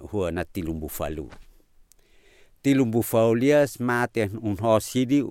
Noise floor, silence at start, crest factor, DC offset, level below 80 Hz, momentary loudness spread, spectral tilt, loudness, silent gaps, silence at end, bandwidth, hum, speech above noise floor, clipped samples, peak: -56 dBFS; 0 s; 18 dB; under 0.1%; -48 dBFS; 11 LU; -6 dB/octave; -24 LUFS; none; 0 s; 17 kHz; none; 33 dB; under 0.1%; -8 dBFS